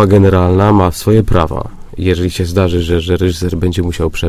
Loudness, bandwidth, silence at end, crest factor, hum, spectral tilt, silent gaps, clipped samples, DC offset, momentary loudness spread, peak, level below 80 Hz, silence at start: -13 LUFS; 15.5 kHz; 0 s; 12 dB; none; -7 dB/octave; none; 0.2%; under 0.1%; 8 LU; 0 dBFS; -22 dBFS; 0 s